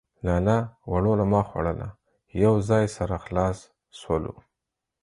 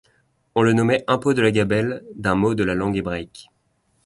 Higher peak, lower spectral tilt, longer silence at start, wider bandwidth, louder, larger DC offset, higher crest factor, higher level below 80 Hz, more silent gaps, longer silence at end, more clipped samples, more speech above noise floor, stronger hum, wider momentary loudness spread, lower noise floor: second, -8 dBFS vs -4 dBFS; first, -8 dB/octave vs -6.5 dB/octave; second, 0.25 s vs 0.55 s; about the same, 11 kHz vs 11.5 kHz; second, -25 LUFS vs -21 LUFS; neither; about the same, 18 dB vs 18 dB; first, -40 dBFS vs -48 dBFS; neither; about the same, 0.7 s vs 0.65 s; neither; first, 61 dB vs 46 dB; neither; first, 14 LU vs 9 LU; first, -85 dBFS vs -66 dBFS